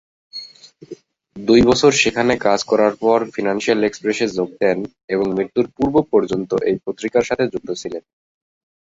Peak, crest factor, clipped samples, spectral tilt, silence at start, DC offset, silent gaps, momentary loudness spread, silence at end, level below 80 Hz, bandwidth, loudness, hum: -2 dBFS; 18 dB; under 0.1%; -4.5 dB/octave; 0.35 s; under 0.1%; 5.04-5.08 s; 15 LU; 0.9 s; -48 dBFS; 8 kHz; -18 LUFS; none